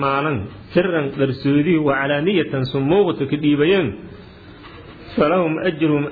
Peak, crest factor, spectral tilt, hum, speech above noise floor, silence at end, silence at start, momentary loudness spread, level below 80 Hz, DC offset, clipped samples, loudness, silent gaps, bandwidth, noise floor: -4 dBFS; 16 dB; -10 dB/octave; none; 22 dB; 0 s; 0 s; 11 LU; -48 dBFS; under 0.1%; under 0.1%; -19 LUFS; none; 4.9 kHz; -40 dBFS